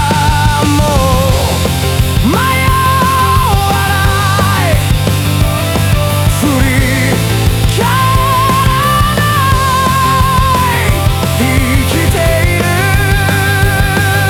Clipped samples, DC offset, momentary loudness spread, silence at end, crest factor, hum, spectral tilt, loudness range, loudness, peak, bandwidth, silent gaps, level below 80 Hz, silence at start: under 0.1%; under 0.1%; 2 LU; 0 s; 10 dB; none; -5 dB/octave; 1 LU; -10 LUFS; 0 dBFS; over 20 kHz; none; -20 dBFS; 0 s